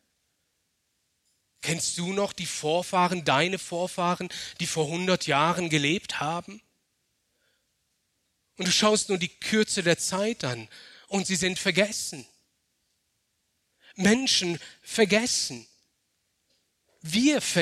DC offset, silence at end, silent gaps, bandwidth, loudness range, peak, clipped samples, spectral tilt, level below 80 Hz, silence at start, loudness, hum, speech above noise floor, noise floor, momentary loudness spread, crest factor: under 0.1%; 0 s; none; 14.5 kHz; 4 LU; -6 dBFS; under 0.1%; -3.5 dB/octave; -66 dBFS; 1.6 s; -26 LUFS; none; 49 dB; -75 dBFS; 10 LU; 22 dB